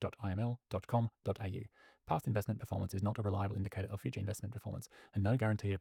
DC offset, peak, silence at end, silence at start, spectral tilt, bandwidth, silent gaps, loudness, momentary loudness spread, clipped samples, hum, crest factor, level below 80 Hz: under 0.1%; -20 dBFS; 0 s; 0 s; -7.5 dB/octave; 16 kHz; none; -39 LUFS; 9 LU; under 0.1%; none; 18 dB; -66 dBFS